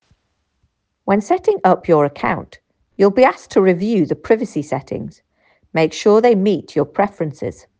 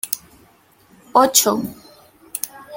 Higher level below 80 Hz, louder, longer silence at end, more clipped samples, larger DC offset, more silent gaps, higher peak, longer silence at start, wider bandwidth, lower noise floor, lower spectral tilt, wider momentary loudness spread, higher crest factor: first, -54 dBFS vs -62 dBFS; about the same, -16 LUFS vs -18 LUFS; first, 0.25 s vs 0 s; neither; neither; neither; about the same, 0 dBFS vs 0 dBFS; first, 1.05 s vs 0.05 s; second, 9.2 kHz vs 17 kHz; first, -67 dBFS vs -53 dBFS; first, -6.5 dB/octave vs -2 dB/octave; second, 12 LU vs 17 LU; second, 16 dB vs 22 dB